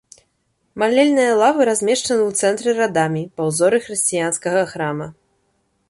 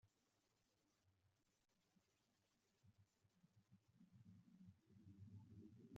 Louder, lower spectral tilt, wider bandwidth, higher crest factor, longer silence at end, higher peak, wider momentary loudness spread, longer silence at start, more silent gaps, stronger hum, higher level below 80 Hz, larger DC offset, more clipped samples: first, -17 LUFS vs -66 LUFS; second, -4 dB/octave vs -8.5 dB/octave; first, 12 kHz vs 7.4 kHz; second, 16 dB vs 24 dB; first, 0.75 s vs 0 s; first, -4 dBFS vs -46 dBFS; first, 9 LU vs 5 LU; first, 0.75 s vs 0.05 s; neither; neither; first, -62 dBFS vs under -90 dBFS; neither; neither